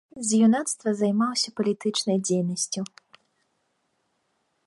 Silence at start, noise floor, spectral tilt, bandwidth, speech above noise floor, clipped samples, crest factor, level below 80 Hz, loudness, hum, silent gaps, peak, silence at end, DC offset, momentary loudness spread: 0.15 s; -73 dBFS; -4.5 dB/octave; 11.5 kHz; 49 dB; under 0.1%; 16 dB; -74 dBFS; -24 LUFS; none; none; -10 dBFS; 1.8 s; under 0.1%; 8 LU